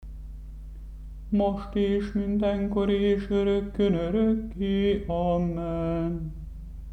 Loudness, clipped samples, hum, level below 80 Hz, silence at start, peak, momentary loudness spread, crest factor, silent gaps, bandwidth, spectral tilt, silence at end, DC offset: -26 LUFS; under 0.1%; none; -40 dBFS; 0 s; -12 dBFS; 19 LU; 14 dB; none; 6.2 kHz; -8.5 dB/octave; 0 s; under 0.1%